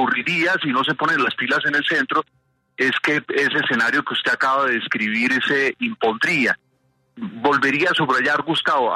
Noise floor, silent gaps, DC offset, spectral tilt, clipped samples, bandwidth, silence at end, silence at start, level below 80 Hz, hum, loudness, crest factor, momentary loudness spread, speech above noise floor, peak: -64 dBFS; none; under 0.1%; -4 dB/octave; under 0.1%; 13.5 kHz; 0 s; 0 s; -66 dBFS; none; -19 LUFS; 14 dB; 4 LU; 45 dB; -6 dBFS